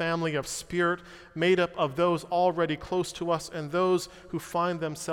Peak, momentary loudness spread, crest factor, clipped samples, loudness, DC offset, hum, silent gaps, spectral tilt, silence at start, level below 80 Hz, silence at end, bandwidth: -12 dBFS; 7 LU; 16 dB; under 0.1%; -28 LUFS; under 0.1%; none; none; -5 dB/octave; 0 s; -58 dBFS; 0 s; 16.5 kHz